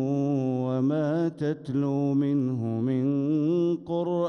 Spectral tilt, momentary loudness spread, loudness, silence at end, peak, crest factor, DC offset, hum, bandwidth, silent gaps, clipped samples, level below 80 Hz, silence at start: -9.5 dB/octave; 3 LU; -26 LUFS; 0 s; -16 dBFS; 10 dB; under 0.1%; none; 6.6 kHz; none; under 0.1%; -68 dBFS; 0 s